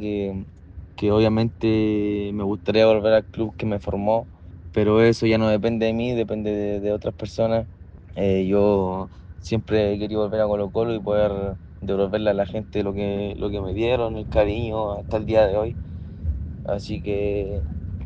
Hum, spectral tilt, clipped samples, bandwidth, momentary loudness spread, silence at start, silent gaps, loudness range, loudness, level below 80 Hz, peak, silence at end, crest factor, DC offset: none; -8 dB/octave; under 0.1%; 8.2 kHz; 12 LU; 0 s; none; 3 LU; -23 LUFS; -40 dBFS; -6 dBFS; 0 s; 18 dB; under 0.1%